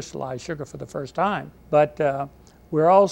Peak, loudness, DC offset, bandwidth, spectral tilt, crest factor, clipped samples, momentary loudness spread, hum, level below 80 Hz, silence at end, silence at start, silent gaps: -4 dBFS; -24 LUFS; under 0.1%; 9.4 kHz; -6.5 dB/octave; 18 dB; under 0.1%; 15 LU; none; -54 dBFS; 0 s; 0 s; none